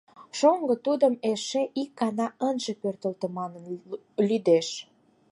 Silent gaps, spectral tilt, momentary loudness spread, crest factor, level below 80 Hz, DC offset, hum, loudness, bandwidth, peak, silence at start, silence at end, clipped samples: none; -5 dB/octave; 13 LU; 20 dB; -80 dBFS; under 0.1%; none; -27 LUFS; 11.5 kHz; -8 dBFS; 0.2 s; 0.5 s; under 0.1%